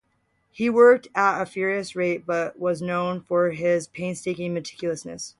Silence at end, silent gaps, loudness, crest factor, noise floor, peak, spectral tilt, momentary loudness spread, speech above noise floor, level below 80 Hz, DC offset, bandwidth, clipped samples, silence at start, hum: 0.1 s; none; -23 LUFS; 18 dB; -69 dBFS; -6 dBFS; -5.5 dB/octave; 13 LU; 47 dB; -66 dBFS; under 0.1%; 11.5 kHz; under 0.1%; 0.6 s; none